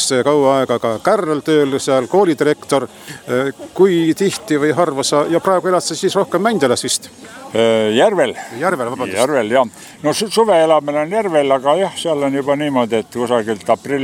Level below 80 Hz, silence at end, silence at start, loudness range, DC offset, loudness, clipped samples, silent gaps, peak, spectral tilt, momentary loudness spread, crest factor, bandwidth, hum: -60 dBFS; 0 s; 0 s; 1 LU; under 0.1%; -16 LUFS; under 0.1%; none; 0 dBFS; -4.5 dB/octave; 6 LU; 16 dB; 17 kHz; none